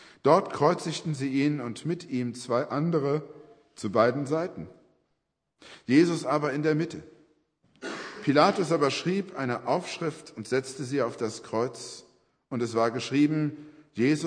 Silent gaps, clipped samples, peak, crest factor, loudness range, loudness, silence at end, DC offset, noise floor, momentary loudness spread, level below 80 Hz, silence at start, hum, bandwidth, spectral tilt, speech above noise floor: none; under 0.1%; -6 dBFS; 22 dB; 4 LU; -27 LUFS; 0 s; under 0.1%; -79 dBFS; 16 LU; -72 dBFS; 0 s; none; 10.5 kHz; -6 dB/octave; 52 dB